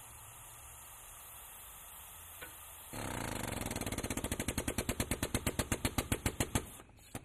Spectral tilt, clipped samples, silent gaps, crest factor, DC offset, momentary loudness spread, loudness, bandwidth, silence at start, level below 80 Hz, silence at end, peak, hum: -3.5 dB/octave; under 0.1%; none; 24 dB; under 0.1%; 14 LU; -39 LUFS; 15.5 kHz; 0 s; -48 dBFS; 0 s; -16 dBFS; none